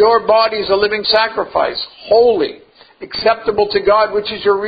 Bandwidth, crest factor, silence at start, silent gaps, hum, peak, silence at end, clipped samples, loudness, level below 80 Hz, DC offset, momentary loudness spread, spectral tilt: 5 kHz; 14 dB; 0 s; none; none; 0 dBFS; 0 s; under 0.1%; -14 LUFS; -48 dBFS; under 0.1%; 7 LU; -6.5 dB/octave